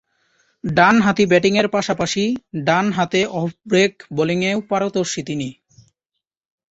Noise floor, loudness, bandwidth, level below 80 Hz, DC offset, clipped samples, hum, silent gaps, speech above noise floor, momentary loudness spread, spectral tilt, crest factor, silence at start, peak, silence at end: -81 dBFS; -18 LUFS; 8 kHz; -54 dBFS; under 0.1%; under 0.1%; none; none; 63 dB; 10 LU; -5 dB/octave; 18 dB; 0.65 s; -2 dBFS; 1.2 s